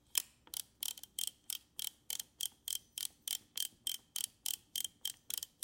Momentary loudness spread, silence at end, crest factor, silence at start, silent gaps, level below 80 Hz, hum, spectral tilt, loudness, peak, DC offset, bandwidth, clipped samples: 5 LU; 0.15 s; 32 dB; 0.15 s; none; -80 dBFS; none; 2.5 dB/octave; -41 LUFS; -12 dBFS; under 0.1%; 17 kHz; under 0.1%